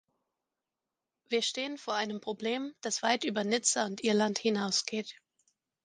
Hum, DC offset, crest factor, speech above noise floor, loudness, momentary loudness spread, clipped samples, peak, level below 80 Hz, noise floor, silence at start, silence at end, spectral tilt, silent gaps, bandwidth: none; under 0.1%; 24 dB; 58 dB; -31 LUFS; 8 LU; under 0.1%; -10 dBFS; -82 dBFS; -89 dBFS; 1.3 s; 0.7 s; -2.5 dB/octave; none; 10 kHz